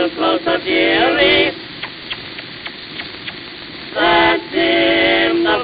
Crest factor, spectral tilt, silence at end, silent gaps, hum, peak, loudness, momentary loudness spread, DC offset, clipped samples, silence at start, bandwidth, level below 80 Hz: 16 dB; -8.5 dB/octave; 0 s; none; none; 0 dBFS; -14 LUFS; 16 LU; under 0.1%; under 0.1%; 0 s; 5.2 kHz; -46 dBFS